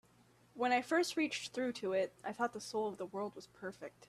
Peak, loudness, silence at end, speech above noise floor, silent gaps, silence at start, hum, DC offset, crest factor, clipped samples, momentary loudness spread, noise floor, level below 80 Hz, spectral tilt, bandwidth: -20 dBFS; -38 LUFS; 0.05 s; 30 dB; none; 0.55 s; none; under 0.1%; 18 dB; under 0.1%; 14 LU; -68 dBFS; -80 dBFS; -3.5 dB/octave; 14 kHz